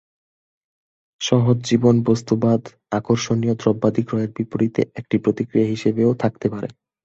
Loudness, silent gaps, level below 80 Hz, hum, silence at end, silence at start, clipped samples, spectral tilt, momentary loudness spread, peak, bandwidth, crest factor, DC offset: -20 LUFS; none; -54 dBFS; none; 0.35 s; 1.2 s; under 0.1%; -7 dB/octave; 8 LU; -2 dBFS; 8 kHz; 18 dB; under 0.1%